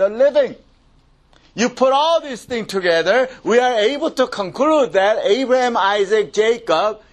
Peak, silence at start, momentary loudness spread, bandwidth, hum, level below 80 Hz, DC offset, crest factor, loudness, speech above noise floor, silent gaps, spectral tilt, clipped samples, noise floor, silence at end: 0 dBFS; 0 s; 6 LU; 12.5 kHz; none; -56 dBFS; under 0.1%; 16 dB; -17 LUFS; 37 dB; none; -3.5 dB/octave; under 0.1%; -53 dBFS; 0.15 s